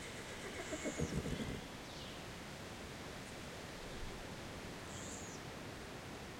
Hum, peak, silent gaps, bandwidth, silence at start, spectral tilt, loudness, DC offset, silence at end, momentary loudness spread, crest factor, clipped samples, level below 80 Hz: none; -26 dBFS; none; 16.5 kHz; 0 s; -4 dB/octave; -46 LUFS; under 0.1%; 0 s; 7 LU; 20 dB; under 0.1%; -58 dBFS